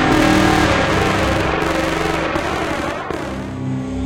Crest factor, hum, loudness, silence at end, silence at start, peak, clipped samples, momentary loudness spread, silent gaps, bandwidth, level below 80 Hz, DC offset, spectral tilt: 16 dB; none; -17 LUFS; 0 s; 0 s; -2 dBFS; under 0.1%; 11 LU; none; 17 kHz; -32 dBFS; under 0.1%; -5 dB/octave